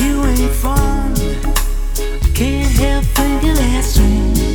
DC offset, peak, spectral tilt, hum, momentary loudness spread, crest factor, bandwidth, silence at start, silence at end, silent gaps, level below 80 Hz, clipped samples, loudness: under 0.1%; 0 dBFS; -5 dB/octave; none; 5 LU; 12 dB; 20 kHz; 0 s; 0 s; none; -14 dBFS; under 0.1%; -16 LUFS